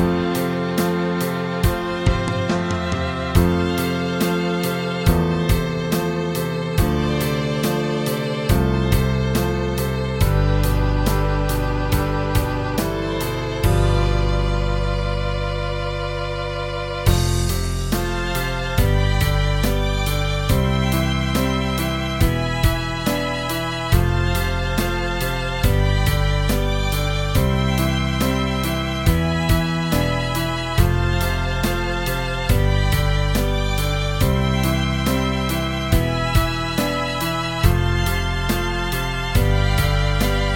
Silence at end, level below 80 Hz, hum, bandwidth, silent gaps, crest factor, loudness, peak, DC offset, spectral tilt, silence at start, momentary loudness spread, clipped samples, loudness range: 0 s; -24 dBFS; none; 17 kHz; none; 18 dB; -21 LUFS; 0 dBFS; under 0.1%; -5.5 dB/octave; 0 s; 4 LU; under 0.1%; 1 LU